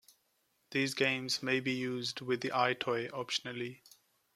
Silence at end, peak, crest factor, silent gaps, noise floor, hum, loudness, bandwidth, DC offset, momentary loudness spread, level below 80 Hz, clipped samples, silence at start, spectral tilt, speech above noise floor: 0.6 s; -14 dBFS; 22 dB; none; -77 dBFS; none; -34 LUFS; 15 kHz; under 0.1%; 7 LU; -78 dBFS; under 0.1%; 0.7 s; -3.5 dB/octave; 42 dB